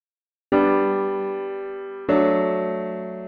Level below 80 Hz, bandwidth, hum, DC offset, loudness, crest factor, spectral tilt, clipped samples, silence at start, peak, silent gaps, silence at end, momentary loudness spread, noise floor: -58 dBFS; 4.9 kHz; none; under 0.1%; -22 LUFS; 18 dB; -9.5 dB/octave; under 0.1%; 0.5 s; -6 dBFS; none; 0 s; 12 LU; under -90 dBFS